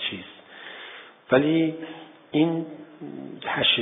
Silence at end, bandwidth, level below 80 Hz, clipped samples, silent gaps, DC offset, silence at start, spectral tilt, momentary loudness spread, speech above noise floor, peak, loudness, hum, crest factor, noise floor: 0 s; 3.9 kHz; -68 dBFS; under 0.1%; none; under 0.1%; 0 s; -3 dB/octave; 21 LU; 20 dB; -6 dBFS; -24 LUFS; none; 22 dB; -44 dBFS